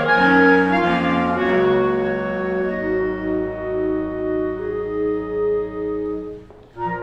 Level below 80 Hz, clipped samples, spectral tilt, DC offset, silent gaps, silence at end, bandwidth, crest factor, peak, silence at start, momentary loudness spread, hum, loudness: -44 dBFS; under 0.1%; -7.5 dB/octave; under 0.1%; none; 0 s; 8 kHz; 18 dB; -2 dBFS; 0 s; 11 LU; none; -20 LUFS